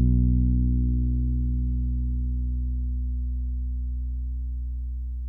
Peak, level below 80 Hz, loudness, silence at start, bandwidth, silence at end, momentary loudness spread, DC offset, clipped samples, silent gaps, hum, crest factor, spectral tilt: -10 dBFS; -26 dBFS; -28 LUFS; 0 s; 0.6 kHz; 0 s; 10 LU; under 0.1%; under 0.1%; none; 60 Hz at -75 dBFS; 14 dB; -14 dB/octave